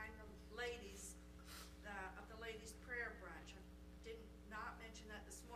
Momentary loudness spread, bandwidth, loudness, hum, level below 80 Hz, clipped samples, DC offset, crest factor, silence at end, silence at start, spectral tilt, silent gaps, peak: 10 LU; 15 kHz; -53 LUFS; none; -62 dBFS; under 0.1%; under 0.1%; 20 dB; 0 s; 0 s; -3.5 dB/octave; none; -34 dBFS